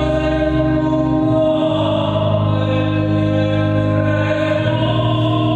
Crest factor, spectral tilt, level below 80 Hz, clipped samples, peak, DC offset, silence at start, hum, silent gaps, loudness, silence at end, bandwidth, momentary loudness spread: 12 dB; -8.5 dB/octave; -32 dBFS; under 0.1%; -2 dBFS; under 0.1%; 0 s; none; none; -16 LUFS; 0 s; 8 kHz; 1 LU